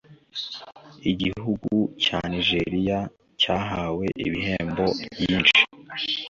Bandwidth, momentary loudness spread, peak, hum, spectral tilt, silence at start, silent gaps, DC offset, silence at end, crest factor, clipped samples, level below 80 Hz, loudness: 7.6 kHz; 14 LU; -4 dBFS; none; -5 dB/octave; 0.1 s; none; under 0.1%; 0 s; 22 dB; under 0.1%; -48 dBFS; -23 LUFS